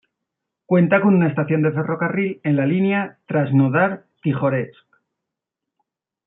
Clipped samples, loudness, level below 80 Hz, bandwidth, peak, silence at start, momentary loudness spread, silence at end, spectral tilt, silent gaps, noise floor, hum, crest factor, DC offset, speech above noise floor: under 0.1%; -19 LUFS; -66 dBFS; 3.9 kHz; -2 dBFS; 0.7 s; 8 LU; 1.55 s; -12.5 dB/octave; none; -83 dBFS; none; 18 dB; under 0.1%; 65 dB